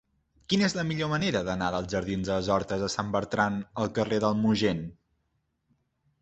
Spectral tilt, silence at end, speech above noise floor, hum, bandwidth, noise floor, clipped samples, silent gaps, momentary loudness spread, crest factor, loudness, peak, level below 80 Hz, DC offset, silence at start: -5.5 dB/octave; 1.3 s; 48 dB; none; 8.4 kHz; -76 dBFS; under 0.1%; none; 5 LU; 20 dB; -28 LUFS; -8 dBFS; -52 dBFS; under 0.1%; 0.5 s